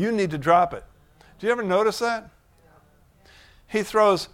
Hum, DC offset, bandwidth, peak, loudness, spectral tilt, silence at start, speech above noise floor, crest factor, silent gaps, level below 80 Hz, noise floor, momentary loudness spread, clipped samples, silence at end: none; under 0.1%; 16.5 kHz; -6 dBFS; -23 LUFS; -5 dB/octave; 0 s; 35 dB; 20 dB; none; -56 dBFS; -57 dBFS; 10 LU; under 0.1%; 0.1 s